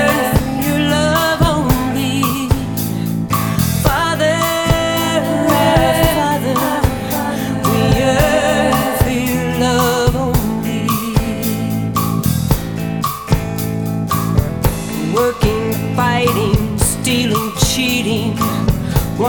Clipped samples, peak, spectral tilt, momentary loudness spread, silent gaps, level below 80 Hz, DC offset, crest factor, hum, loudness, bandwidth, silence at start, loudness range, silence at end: under 0.1%; 0 dBFS; -5 dB/octave; 6 LU; none; -28 dBFS; 0.2%; 16 dB; none; -16 LUFS; over 20 kHz; 0 s; 3 LU; 0 s